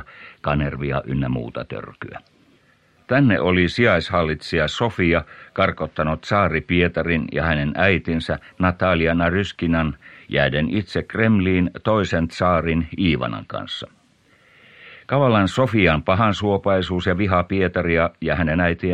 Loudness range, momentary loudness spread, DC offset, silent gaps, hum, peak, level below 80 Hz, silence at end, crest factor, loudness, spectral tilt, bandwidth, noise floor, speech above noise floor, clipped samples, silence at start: 3 LU; 12 LU; under 0.1%; none; none; -2 dBFS; -38 dBFS; 0 s; 18 dB; -20 LUFS; -7 dB/octave; 9.8 kHz; -58 dBFS; 38 dB; under 0.1%; 0 s